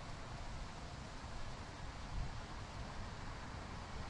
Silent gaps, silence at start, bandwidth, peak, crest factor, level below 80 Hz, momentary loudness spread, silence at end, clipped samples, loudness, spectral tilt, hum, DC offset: none; 0 s; 11 kHz; -30 dBFS; 18 dB; -50 dBFS; 3 LU; 0 s; under 0.1%; -49 LUFS; -5 dB/octave; none; under 0.1%